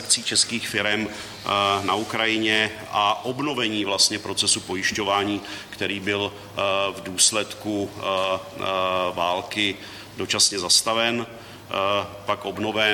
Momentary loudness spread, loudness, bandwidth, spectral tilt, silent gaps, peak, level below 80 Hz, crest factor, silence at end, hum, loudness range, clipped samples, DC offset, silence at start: 10 LU; -22 LUFS; 17.5 kHz; -1.5 dB/octave; none; -4 dBFS; -60 dBFS; 20 dB; 0 s; none; 2 LU; under 0.1%; under 0.1%; 0 s